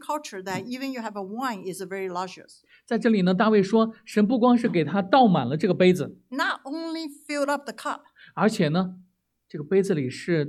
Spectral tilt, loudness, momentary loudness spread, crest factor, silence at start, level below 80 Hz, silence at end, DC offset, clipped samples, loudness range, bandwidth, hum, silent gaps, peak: -6.5 dB/octave; -24 LUFS; 13 LU; 18 dB; 0 s; -72 dBFS; 0 s; under 0.1%; under 0.1%; 7 LU; 14 kHz; none; none; -6 dBFS